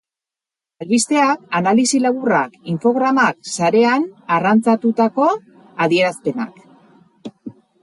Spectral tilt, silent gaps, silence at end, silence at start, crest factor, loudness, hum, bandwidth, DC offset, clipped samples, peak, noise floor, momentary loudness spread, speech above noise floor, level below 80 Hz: -4.5 dB/octave; none; 0.3 s; 0.8 s; 14 dB; -17 LUFS; none; 11.5 kHz; under 0.1%; under 0.1%; -2 dBFS; -88 dBFS; 14 LU; 72 dB; -68 dBFS